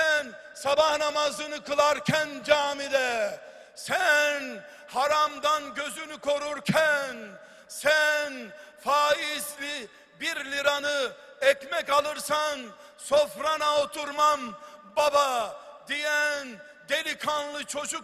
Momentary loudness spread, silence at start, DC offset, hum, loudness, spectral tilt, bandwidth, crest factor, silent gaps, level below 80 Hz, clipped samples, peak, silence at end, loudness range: 16 LU; 0 s; under 0.1%; none; -26 LUFS; -2 dB/octave; 14.5 kHz; 22 dB; none; -68 dBFS; under 0.1%; -6 dBFS; 0 s; 2 LU